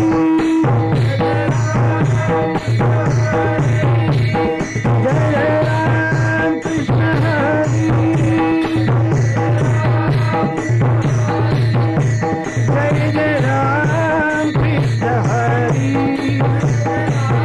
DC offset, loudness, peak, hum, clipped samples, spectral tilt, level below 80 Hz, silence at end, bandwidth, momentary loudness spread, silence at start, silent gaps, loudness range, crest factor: under 0.1%; -16 LUFS; -6 dBFS; none; under 0.1%; -7.5 dB/octave; -38 dBFS; 0 s; 9.2 kHz; 2 LU; 0 s; none; 1 LU; 8 dB